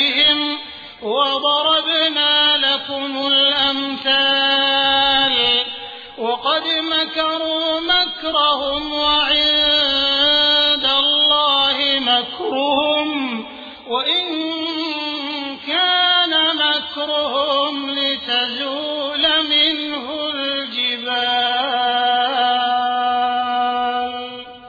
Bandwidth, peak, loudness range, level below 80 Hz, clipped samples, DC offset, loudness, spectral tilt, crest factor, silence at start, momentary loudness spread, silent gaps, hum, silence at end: 5 kHz; -4 dBFS; 4 LU; -52 dBFS; under 0.1%; under 0.1%; -16 LUFS; -3 dB/octave; 14 dB; 0 s; 10 LU; none; none; 0 s